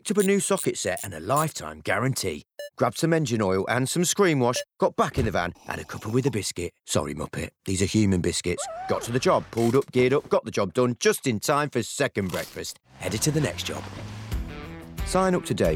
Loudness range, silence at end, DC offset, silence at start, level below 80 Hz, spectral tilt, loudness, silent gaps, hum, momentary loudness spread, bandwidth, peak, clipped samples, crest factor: 4 LU; 0 s; under 0.1%; 0.05 s; -46 dBFS; -4.5 dB/octave; -25 LUFS; none; none; 12 LU; over 20 kHz; -8 dBFS; under 0.1%; 16 dB